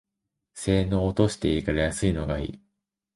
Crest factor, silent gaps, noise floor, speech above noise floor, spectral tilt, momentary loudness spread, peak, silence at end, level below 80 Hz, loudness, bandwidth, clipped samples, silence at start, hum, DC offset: 18 dB; none; -83 dBFS; 59 dB; -6 dB/octave; 8 LU; -8 dBFS; 0.6 s; -38 dBFS; -26 LUFS; 11.5 kHz; under 0.1%; 0.55 s; none; under 0.1%